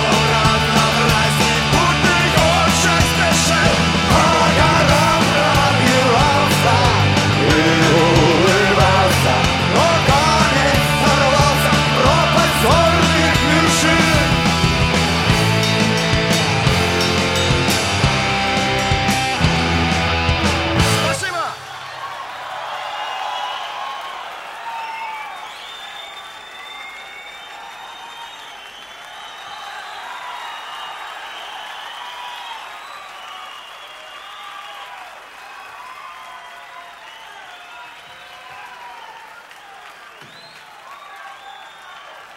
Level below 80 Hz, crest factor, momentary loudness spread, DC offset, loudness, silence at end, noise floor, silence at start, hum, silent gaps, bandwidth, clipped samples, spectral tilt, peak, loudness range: -32 dBFS; 16 dB; 22 LU; under 0.1%; -14 LUFS; 0.05 s; -40 dBFS; 0 s; none; none; 16.5 kHz; under 0.1%; -4 dB/octave; 0 dBFS; 22 LU